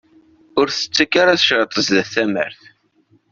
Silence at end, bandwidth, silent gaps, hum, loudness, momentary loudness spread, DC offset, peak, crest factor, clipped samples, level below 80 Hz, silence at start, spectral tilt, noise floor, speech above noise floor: 0.8 s; 7.6 kHz; none; none; -16 LUFS; 10 LU; under 0.1%; 0 dBFS; 18 dB; under 0.1%; -58 dBFS; 0.55 s; -3 dB/octave; -58 dBFS; 41 dB